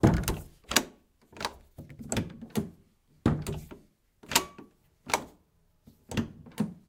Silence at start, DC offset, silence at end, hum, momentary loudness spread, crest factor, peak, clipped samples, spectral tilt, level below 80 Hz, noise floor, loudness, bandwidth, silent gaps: 0 s; under 0.1%; 0.15 s; none; 22 LU; 28 dB; -4 dBFS; under 0.1%; -4 dB/octave; -46 dBFS; -67 dBFS; -32 LUFS; 17.5 kHz; none